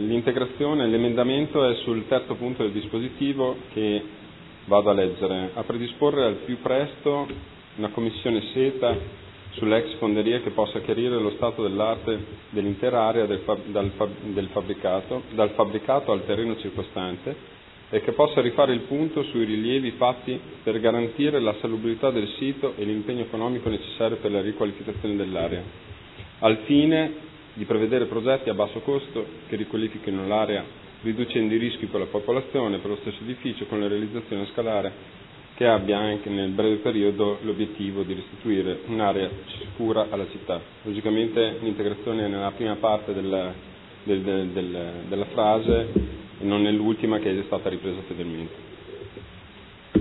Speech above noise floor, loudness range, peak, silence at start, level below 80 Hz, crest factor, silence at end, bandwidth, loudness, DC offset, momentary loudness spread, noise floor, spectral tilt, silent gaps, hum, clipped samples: 21 dB; 3 LU; -4 dBFS; 0 s; -50 dBFS; 22 dB; 0 s; 4.1 kHz; -25 LUFS; under 0.1%; 11 LU; -46 dBFS; -10 dB/octave; none; none; under 0.1%